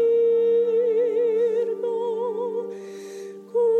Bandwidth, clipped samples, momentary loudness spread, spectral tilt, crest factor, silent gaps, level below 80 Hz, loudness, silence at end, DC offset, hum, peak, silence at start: 8.2 kHz; under 0.1%; 17 LU; -6 dB/octave; 8 dB; none; under -90 dBFS; -23 LUFS; 0 s; under 0.1%; none; -14 dBFS; 0 s